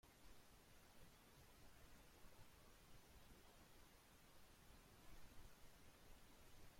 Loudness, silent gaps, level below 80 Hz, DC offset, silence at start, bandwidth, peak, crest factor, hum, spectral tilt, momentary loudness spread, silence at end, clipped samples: -69 LUFS; none; -72 dBFS; under 0.1%; 0.05 s; 16.5 kHz; -50 dBFS; 16 dB; none; -3.5 dB/octave; 2 LU; 0 s; under 0.1%